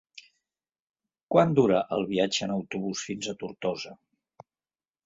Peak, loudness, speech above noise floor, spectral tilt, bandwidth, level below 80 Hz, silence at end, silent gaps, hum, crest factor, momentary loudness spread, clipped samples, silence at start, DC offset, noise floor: -6 dBFS; -27 LUFS; over 63 dB; -5 dB/octave; 8 kHz; -66 dBFS; 1.1 s; 0.80-0.87 s, 1.23-1.27 s; none; 22 dB; 12 LU; under 0.1%; 0.15 s; under 0.1%; under -90 dBFS